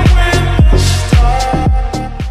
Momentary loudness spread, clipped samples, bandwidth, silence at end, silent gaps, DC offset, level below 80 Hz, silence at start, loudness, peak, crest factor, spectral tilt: 7 LU; under 0.1%; 13.5 kHz; 0 s; none; under 0.1%; -12 dBFS; 0 s; -12 LUFS; 0 dBFS; 10 dB; -5.5 dB/octave